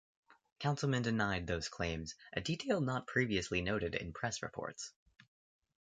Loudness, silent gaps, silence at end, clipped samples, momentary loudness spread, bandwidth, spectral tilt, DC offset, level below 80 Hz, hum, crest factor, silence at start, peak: -37 LUFS; 0.52-0.56 s; 0.9 s; under 0.1%; 9 LU; 9.4 kHz; -5 dB/octave; under 0.1%; -56 dBFS; none; 20 dB; 0.3 s; -18 dBFS